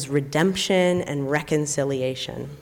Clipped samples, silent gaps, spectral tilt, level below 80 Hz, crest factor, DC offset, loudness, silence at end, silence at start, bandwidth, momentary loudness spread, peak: under 0.1%; none; -4.5 dB/octave; -54 dBFS; 14 dB; under 0.1%; -23 LUFS; 0 s; 0 s; 18.5 kHz; 7 LU; -10 dBFS